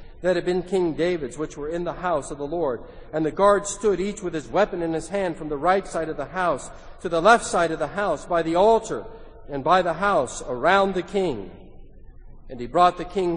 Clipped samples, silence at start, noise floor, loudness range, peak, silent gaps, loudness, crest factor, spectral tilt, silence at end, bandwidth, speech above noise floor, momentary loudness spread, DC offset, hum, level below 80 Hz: under 0.1%; 0 s; -42 dBFS; 3 LU; -2 dBFS; none; -23 LUFS; 22 dB; -5 dB/octave; 0 s; 10 kHz; 20 dB; 12 LU; under 0.1%; none; -44 dBFS